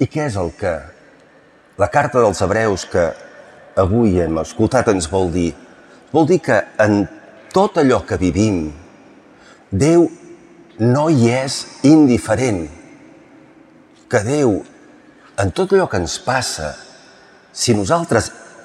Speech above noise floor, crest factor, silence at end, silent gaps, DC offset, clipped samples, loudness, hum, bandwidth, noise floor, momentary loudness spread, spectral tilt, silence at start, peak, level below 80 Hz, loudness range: 33 dB; 16 dB; 0.2 s; none; under 0.1%; under 0.1%; -17 LUFS; none; 13.5 kHz; -49 dBFS; 10 LU; -5.5 dB/octave; 0 s; -2 dBFS; -46 dBFS; 4 LU